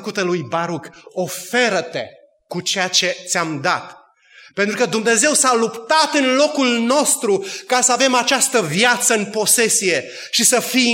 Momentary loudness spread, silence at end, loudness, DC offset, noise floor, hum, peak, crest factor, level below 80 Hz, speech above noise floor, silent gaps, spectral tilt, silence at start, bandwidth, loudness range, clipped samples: 11 LU; 0 s; -16 LUFS; under 0.1%; -47 dBFS; none; 0 dBFS; 18 dB; -72 dBFS; 30 dB; none; -2 dB/octave; 0 s; 16.5 kHz; 5 LU; under 0.1%